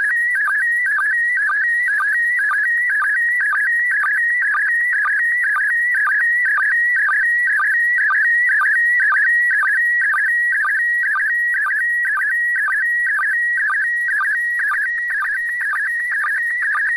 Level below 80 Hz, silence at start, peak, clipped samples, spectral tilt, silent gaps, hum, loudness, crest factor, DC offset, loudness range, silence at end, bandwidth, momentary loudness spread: -62 dBFS; 0 s; -10 dBFS; under 0.1%; 1 dB/octave; none; none; -15 LUFS; 6 dB; under 0.1%; 3 LU; 0 s; 13.5 kHz; 4 LU